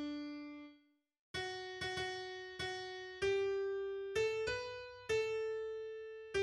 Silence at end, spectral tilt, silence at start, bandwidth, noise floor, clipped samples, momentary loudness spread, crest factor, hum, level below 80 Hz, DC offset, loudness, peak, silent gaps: 0 s; -4 dB/octave; 0 s; 12.5 kHz; -71 dBFS; under 0.1%; 11 LU; 16 dB; none; -66 dBFS; under 0.1%; -41 LUFS; -26 dBFS; 1.19-1.34 s